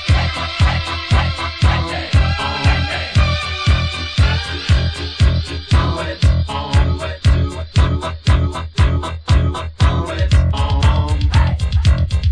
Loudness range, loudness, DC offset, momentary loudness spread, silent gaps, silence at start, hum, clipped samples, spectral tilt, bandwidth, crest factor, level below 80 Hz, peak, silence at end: 1 LU; -17 LUFS; under 0.1%; 4 LU; none; 0 s; none; under 0.1%; -5.5 dB/octave; 10.5 kHz; 14 dB; -18 dBFS; -2 dBFS; 0 s